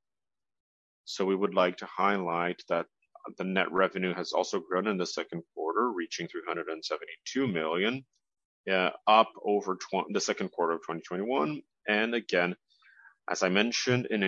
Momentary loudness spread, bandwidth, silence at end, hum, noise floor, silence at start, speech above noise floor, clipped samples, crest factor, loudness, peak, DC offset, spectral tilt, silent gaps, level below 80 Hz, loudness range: 10 LU; 8 kHz; 0 s; none; under -90 dBFS; 1.05 s; over 60 dB; under 0.1%; 22 dB; -30 LUFS; -10 dBFS; under 0.1%; -4 dB/octave; 8.45-8.64 s; -78 dBFS; 4 LU